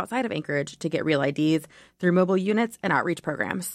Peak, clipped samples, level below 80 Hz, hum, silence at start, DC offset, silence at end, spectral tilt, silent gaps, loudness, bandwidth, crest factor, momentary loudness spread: -10 dBFS; under 0.1%; -66 dBFS; none; 0 s; under 0.1%; 0 s; -6 dB/octave; none; -25 LUFS; 15.5 kHz; 16 dB; 6 LU